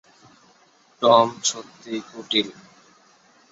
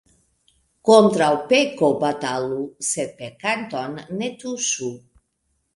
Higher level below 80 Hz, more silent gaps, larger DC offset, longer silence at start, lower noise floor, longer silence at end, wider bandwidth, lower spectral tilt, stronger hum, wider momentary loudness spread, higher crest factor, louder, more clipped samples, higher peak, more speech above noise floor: about the same, -68 dBFS vs -64 dBFS; neither; neither; first, 1 s vs 0.85 s; second, -57 dBFS vs -71 dBFS; first, 1 s vs 0.8 s; second, 8 kHz vs 11.5 kHz; about the same, -2.5 dB/octave vs -3.5 dB/octave; neither; about the same, 16 LU vs 14 LU; about the same, 22 dB vs 22 dB; about the same, -21 LUFS vs -21 LUFS; neither; about the same, -2 dBFS vs 0 dBFS; second, 36 dB vs 51 dB